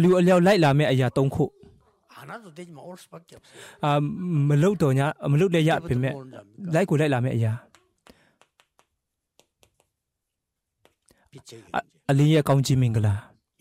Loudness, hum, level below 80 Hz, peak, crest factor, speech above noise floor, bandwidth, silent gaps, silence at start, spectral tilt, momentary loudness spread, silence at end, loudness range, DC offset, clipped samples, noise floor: -22 LUFS; none; -56 dBFS; -10 dBFS; 14 dB; 61 dB; 15 kHz; none; 0 s; -7 dB/octave; 22 LU; 0.4 s; 9 LU; under 0.1%; under 0.1%; -83 dBFS